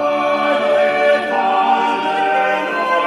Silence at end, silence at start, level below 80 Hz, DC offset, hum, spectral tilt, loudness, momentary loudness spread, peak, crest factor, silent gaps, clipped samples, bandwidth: 0 s; 0 s; -66 dBFS; under 0.1%; none; -4 dB/octave; -15 LUFS; 3 LU; -4 dBFS; 12 dB; none; under 0.1%; 11.5 kHz